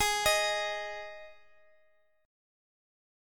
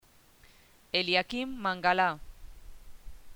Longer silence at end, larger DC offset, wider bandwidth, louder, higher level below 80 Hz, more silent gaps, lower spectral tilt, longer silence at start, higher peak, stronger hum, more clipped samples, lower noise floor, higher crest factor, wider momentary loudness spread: first, 1.9 s vs 0 s; neither; second, 17.5 kHz vs over 20 kHz; about the same, -30 LUFS vs -29 LUFS; second, -58 dBFS vs -52 dBFS; neither; second, 0.5 dB/octave vs -4.5 dB/octave; second, 0 s vs 0.95 s; about the same, -14 dBFS vs -12 dBFS; neither; neither; first, -70 dBFS vs -59 dBFS; about the same, 22 dB vs 22 dB; first, 20 LU vs 8 LU